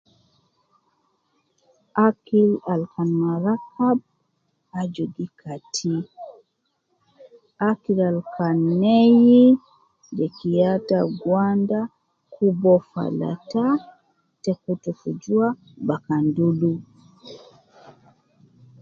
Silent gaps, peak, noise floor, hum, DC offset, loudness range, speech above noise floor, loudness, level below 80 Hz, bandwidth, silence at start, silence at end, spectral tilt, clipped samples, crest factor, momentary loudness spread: none; -4 dBFS; -73 dBFS; none; under 0.1%; 9 LU; 53 dB; -21 LUFS; -66 dBFS; 7.6 kHz; 1.95 s; 1.45 s; -7.5 dB/octave; under 0.1%; 18 dB; 13 LU